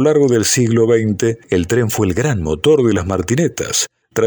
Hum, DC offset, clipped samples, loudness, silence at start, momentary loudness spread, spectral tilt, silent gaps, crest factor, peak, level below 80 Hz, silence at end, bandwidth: none; under 0.1%; under 0.1%; -15 LUFS; 0 s; 5 LU; -5 dB/octave; none; 12 dB; -2 dBFS; -40 dBFS; 0 s; over 20 kHz